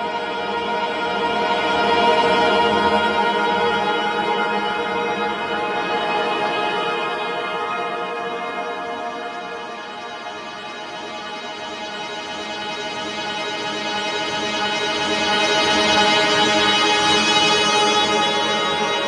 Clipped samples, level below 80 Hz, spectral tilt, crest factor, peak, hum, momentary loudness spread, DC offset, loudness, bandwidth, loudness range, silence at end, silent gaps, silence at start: under 0.1%; -58 dBFS; -2.5 dB/octave; 16 dB; -4 dBFS; none; 14 LU; under 0.1%; -19 LUFS; 11.5 kHz; 13 LU; 0 s; none; 0 s